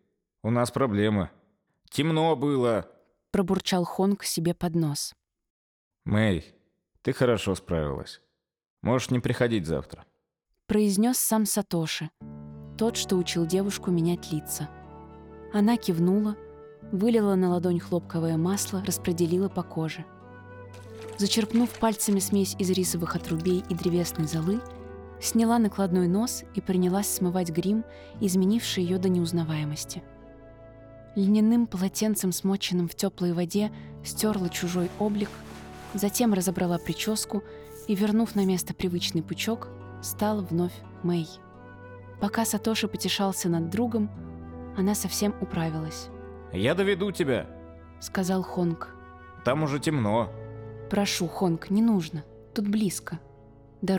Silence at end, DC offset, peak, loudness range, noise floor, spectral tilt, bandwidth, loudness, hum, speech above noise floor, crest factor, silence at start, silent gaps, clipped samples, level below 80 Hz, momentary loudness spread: 0 s; under 0.1%; -10 dBFS; 3 LU; -78 dBFS; -5 dB/octave; 20 kHz; -27 LUFS; none; 52 dB; 16 dB; 0.45 s; 5.50-5.91 s, 8.70-8.77 s; under 0.1%; -54 dBFS; 17 LU